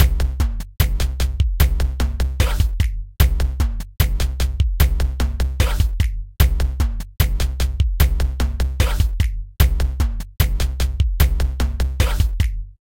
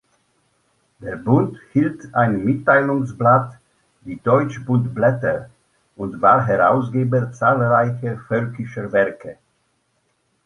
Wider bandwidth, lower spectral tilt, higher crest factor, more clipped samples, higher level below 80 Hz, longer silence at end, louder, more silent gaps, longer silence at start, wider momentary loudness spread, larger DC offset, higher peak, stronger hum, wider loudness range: first, 17 kHz vs 10 kHz; second, -5 dB/octave vs -9 dB/octave; about the same, 18 dB vs 18 dB; neither; first, -20 dBFS vs -56 dBFS; second, 0.1 s vs 1.15 s; second, -21 LUFS vs -18 LUFS; neither; second, 0 s vs 1 s; second, 5 LU vs 14 LU; neither; about the same, 0 dBFS vs -2 dBFS; neither; about the same, 1 LU vs 2 LU